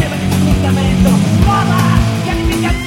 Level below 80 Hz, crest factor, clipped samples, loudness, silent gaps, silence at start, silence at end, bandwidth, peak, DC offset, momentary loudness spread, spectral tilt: -20 dBFS; 12 dB; under 0.1%; -12 LUFS; none; 0 s; 0 s; 16.5 kHz; 0 dBFS; under 0.1%; 4 LU; -6 dB/octave